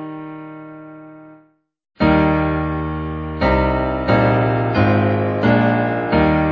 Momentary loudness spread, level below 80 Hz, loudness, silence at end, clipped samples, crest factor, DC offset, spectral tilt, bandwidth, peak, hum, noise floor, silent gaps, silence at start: 18 LU; -32 dBFS; -17 LUFS; 0 s; under 0.1%; 16 dB; under 0.1%; -9.5 dB/octave; 6 kHz; -2 dBFS; none; -54 dBFS; none; 0 s